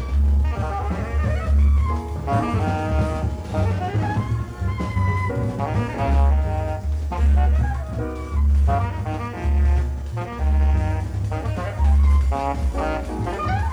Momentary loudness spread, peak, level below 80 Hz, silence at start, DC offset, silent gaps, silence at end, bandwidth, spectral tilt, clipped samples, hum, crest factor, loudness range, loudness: 8 LU; -8 dBFS; -22 dBFS; 0 s; under 0.1%; none; 0 s; 8.4 kHz; -8 dB/octave; under 0.1%; none; 12 dB; 2 LU; -22 LUFS